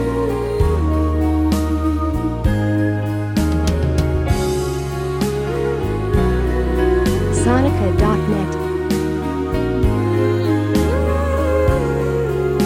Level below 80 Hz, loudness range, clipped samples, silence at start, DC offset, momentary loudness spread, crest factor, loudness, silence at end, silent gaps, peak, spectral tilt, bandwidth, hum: -24 dBFS; 2 LU; under 0.1%; 0 s; under 0.1%; 4 LU; 14 dB; -18 LUFS; 0 s; none; -2 dBFS; -7 dB/octave; 16 kHz; none